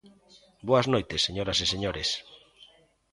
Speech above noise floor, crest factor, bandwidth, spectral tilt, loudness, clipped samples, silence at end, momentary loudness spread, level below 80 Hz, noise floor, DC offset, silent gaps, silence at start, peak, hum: 31 dB; 22 dB; 11.5 kHz; -4 dB/octave; -27 LUFS; under 0.1%; 0.75 s; 7 LU; -50 dBFS; -58 dBFS; under 0.1%; none; 0.05 s; -8 dBFS; none